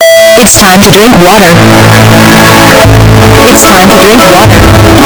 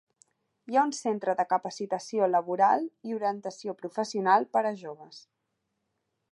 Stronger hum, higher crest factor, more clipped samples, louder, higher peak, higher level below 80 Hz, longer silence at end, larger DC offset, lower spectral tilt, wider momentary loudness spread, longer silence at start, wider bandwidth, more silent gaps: neither; second, 0 dB vs 20 dB; first, 40% vs under 0.1%; first, 0 LUFS vs -28 LUFS; first, 0 dBFS vs -10 dBFS; first, -16 dBFS vs -88 dBFS; second, 0 s vs 1.15 s; neither; about the same, -4 dB/octave vs -4.5 dB/octave; second, 1 LU vs 12 LU; second, 0 s vs 0.7 s; first, over 20 kHz vs 11.5 kHz; neither